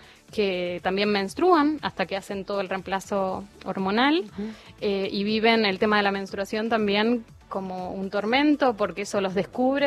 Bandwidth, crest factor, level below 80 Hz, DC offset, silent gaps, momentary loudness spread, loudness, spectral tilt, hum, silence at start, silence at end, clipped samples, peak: 13.5 kHz; 18 dB; -56 dBFS; under 0.1%; none; 12 LU; -25 LUFS; -5 dB/octave; none; 0 s; 0 s; under 0.1%; -8 dBFS